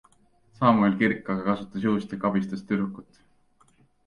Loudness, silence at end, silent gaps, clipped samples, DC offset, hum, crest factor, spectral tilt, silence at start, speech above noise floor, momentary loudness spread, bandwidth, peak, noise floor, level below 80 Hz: -25 LUFS; 1.05 s; none; under 0.1%; under 0.1%; none; 20 dB; -8 dB/octave; 0.6 s; 37 dB; 8 LU; 6.8 kHz; -6 dBFS; -62 dBFS; -62 dBFS